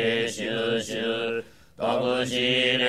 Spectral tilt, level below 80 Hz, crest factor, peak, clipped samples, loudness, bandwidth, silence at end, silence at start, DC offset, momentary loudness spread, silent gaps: -3.5 dB/octave; -62 dBFS; 16 dB; -8 dBFS; under 0.1%; -26 LUFS; 14.5 kHz; 0 s; 0 s; 0.2%; 8 LU; none